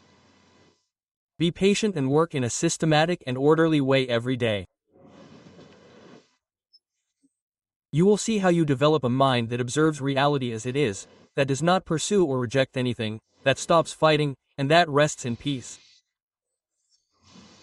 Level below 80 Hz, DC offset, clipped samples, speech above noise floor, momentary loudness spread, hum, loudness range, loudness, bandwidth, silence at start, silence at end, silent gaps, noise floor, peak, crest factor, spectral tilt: -60 dBFS; under 0.1%; under 0.1%; 63 dB; 9 LU; none; 5 LU; -23 LUFS; 12 kHz; 1.4 s; 1.85 s; 7.41-7.48 s, 7.76-7.80 s; -86 dBFS; -4 dBFS; 22 dB; -5 dB/octave